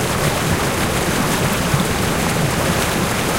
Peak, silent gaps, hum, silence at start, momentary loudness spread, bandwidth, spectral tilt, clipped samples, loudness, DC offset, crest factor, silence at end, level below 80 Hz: -4 dBFS; none; none; 0 s; 1 LU; 16 kHz; -4 dB/octave; under 0.1%; -18 LUFS; under 0.1%; 14 dB; 0 s; -32 dBFS